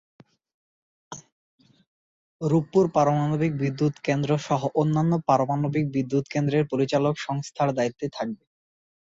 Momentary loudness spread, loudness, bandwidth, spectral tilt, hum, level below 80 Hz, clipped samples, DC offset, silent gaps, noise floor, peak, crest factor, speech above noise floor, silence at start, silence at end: 10 LU; -24 LUFS; 7.8 kHz; -7 dB/octave; none; -62 dBFS; under 0.1%; under 0.1%; 1.32-1.58 s, 1.87-2.39 s; under -90 dBFS; -6 dBFS; 20 dB; over 66 dB; 1.1 s; 0.85 s